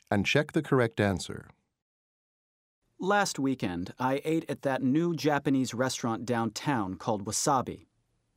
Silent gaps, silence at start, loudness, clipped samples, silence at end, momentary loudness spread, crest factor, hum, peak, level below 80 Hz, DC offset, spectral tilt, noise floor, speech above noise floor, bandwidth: 1.82-2.82 s; 0.1 s; -29 LUFS; under 0.1%; 0.55 s; 8 LU; 20 dB; none; -10 dBFS; -62 dBFS; under 0.1%; -5 dB/octave; under -90 dBFS; over 61 dB; 16 kHz